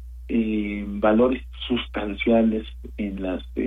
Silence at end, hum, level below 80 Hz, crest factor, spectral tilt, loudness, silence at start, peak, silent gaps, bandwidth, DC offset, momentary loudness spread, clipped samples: 0 s; none; -38 dBFS; 16 dB; -8 dB/octave; -24 LUFS; 0 s; -8 dBFS; none; 3.9 kHz; under 0.1%; 11 LU; under 0.1%